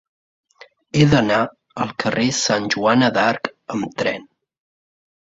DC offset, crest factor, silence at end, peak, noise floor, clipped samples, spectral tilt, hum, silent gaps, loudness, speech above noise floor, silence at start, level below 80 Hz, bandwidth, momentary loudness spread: under 0.1%; 18 dB; 1.15 s; -2 dBFS; -49 dBFS; under 0.1%; -5 dB/octave; none; none; -19 LUFS; 31 dB; 0.95 s; -50 dBFS; 8 kHz; 11 LU